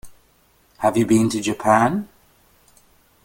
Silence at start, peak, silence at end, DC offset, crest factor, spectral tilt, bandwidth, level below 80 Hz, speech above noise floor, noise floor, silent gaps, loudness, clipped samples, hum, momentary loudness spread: 0.05 s; -2 dBFS; 1.2 s; under 0.1%; 20 dB; -5.5 dB/octave; 17 kHz; -54 dBFS; 40 dB; -58 dBFS; none; -19 LUFS; under 0.1%; none; 9 LU